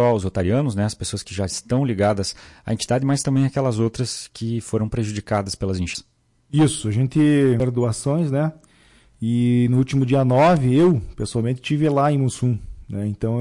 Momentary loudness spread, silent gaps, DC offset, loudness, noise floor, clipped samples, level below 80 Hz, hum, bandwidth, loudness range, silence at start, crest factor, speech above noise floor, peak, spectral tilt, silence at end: 11 LU; none; under 0.1%; -21 LUFS; -54 dBFS; under 0.1%; -46 dBFS; none; 11.5 kHz; 5 LU; 0 s; 12 dB; 34 dB; -10 dBFS; -6.5 dB/octave; 0 s